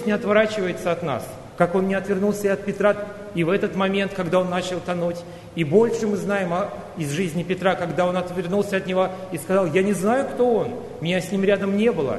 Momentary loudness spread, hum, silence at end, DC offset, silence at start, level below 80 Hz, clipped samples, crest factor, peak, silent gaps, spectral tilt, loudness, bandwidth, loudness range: 8 LU; none; 0 s; under 0.1%; 0 s; -54 dBFS; under 0.1%; 18 dB; -4 dBFS; none; -6 dB/octave; -22 LUFS; 12.5 kHz; 2 LU